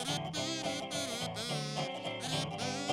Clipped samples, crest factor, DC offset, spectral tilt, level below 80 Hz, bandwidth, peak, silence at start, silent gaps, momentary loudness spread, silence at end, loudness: under 0.1%; 16 dB; under 0.1%; -3.5 dB/octave; -68 dBFS; 16 kHz; -20 dBFS; 0 s; none; 2 LU; 0 s; -36 LUFS